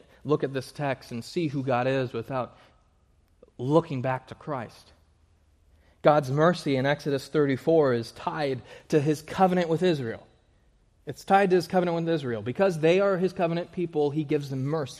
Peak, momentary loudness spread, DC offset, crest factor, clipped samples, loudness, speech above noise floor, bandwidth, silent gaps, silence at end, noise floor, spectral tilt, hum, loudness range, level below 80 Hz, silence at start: -6 dBFS; 12 LU; under 0.1%; 20 dB; under 0.1%; -26 LUFS; 38 dB; 14 kHz; none; 0 s; -63 dBFS; -7 dB/octave; none; 6 LU; -62 dBFS; 0.25 s